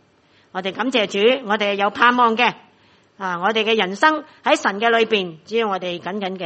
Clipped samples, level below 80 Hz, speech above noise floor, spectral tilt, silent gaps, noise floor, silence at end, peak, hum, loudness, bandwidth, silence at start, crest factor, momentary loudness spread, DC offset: under 0.1%; -70 dBFS; 37 dB; -4 dB/octave; none; -56 dBFS; 0 s; 0 dBFS; none; -19 LUFS; 8.4 kHz; 0.55 s; 20 dB; 11 LU; under 0.1%